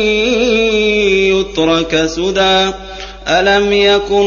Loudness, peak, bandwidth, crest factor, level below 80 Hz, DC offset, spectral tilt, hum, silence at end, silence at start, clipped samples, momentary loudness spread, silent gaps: -12 LUFS; 0 dBFS; 7.2 kHz; 12 dB; -34 dBFS; under 0.1%; -4 dB/octave; none; 0 s; 0 s; under 0.1%; 5 LU; none